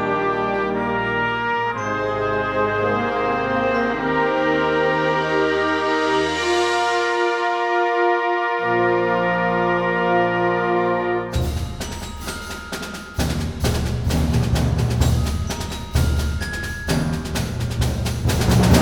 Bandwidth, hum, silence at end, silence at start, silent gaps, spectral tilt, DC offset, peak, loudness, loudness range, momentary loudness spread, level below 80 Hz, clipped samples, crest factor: 19.5 kHz; none; 0 s; 0 s; none; -5.5 dB/octave; under 0.1%; -2 dBFS; -20 LUFS; 4 LU; 7 LU; -32 dBFS; under 0.1%; 18 dB